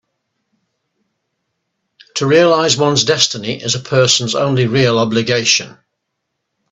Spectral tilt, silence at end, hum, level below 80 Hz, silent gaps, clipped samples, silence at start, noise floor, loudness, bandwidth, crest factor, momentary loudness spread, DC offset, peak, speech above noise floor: -3.5 dB/octave; 1 s; none; -54 dBFS; none; under 0.1%; 2.15 s; -74 dBFS; -13 LUFS; 8.4 kHz; 16 dB; 8 LU; under 0.1%; 0 dBFS; 60 dB